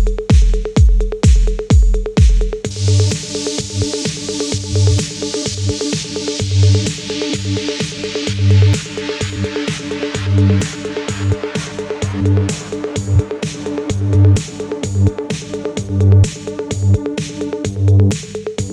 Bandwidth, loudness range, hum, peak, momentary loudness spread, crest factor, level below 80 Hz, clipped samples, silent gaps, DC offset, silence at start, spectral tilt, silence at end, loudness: 11 kHz; 3 LU; none; 0 dBFS; 10 LU; 14 dB; -20 dBFS; under 0.1%; none; under 0.1%; 0 s; -5.5 dB/octave; 0 s; -16 LUFS